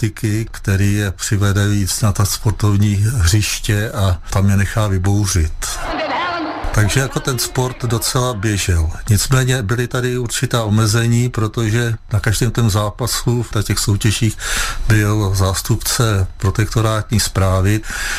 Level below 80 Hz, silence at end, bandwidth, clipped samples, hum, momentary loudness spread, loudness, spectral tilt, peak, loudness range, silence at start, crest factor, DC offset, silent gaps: -28 dBFS; 0 s; 15.5 kHz; under 0.1%; none; 4 LU; -17 LUFS; -4.5 dB/octave; -2 dBFS; 2 LU; 0 s; 14 dB; under 0.1%; none